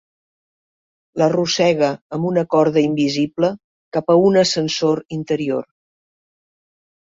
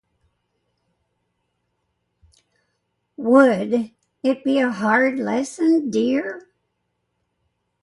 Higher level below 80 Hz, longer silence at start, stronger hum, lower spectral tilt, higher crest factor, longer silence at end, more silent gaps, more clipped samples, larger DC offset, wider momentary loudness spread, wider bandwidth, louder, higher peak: first, -60 dBFS vs -68 dBFS; second, 1.15 s vs 3.2 s; neither; about the same, -5.5 dB/octave vs -5.5 dB/octave; second, 16 dB vs 22 dB; about the same, 1.4 s vs 1.45 s; first, 2.01-2.10 s, 3.64-3.92 s, 5.05-5.09 s vs none; neither; neither; second, 9 LU vs 12 LU; second, 8 kHz vs 11.5 kHz; about the same, -18 LUFS vs -19 LUFS; about the same, -2 dBFS vs -2 dBFS